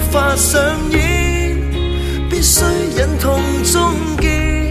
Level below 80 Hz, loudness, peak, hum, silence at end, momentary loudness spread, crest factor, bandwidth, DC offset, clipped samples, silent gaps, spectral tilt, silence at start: -20 dBFS; -15 LUFS; 0 dBFS; none; 0 s; 7 LU; 14 dB; 14.5 kHz; under 0.1%; under 0.1%; none; -4 dB/octave; 0 s